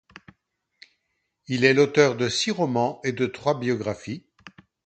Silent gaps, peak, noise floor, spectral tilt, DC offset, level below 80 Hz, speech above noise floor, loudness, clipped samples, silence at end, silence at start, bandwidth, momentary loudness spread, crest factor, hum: none; 0 dBFS; -76 dBFS; -5 dB/octave; under 0.1%; -62 dBFS; 54 dB; -23 LUFS; under 0.1%; 0.35 s; 1.5 s; 9.2 kHz; 13 LU; 24 dB; none